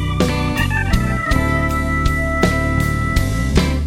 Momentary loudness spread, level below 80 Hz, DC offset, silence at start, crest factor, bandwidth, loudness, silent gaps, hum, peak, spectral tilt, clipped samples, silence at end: 2 LU; -22 dBFS; under 0.1%; 0 s; 16 dB; 16.5 kHz; -18 LUFS; none; none; 0 dBFS; -6 dB/octave; under 0.1%; 0 s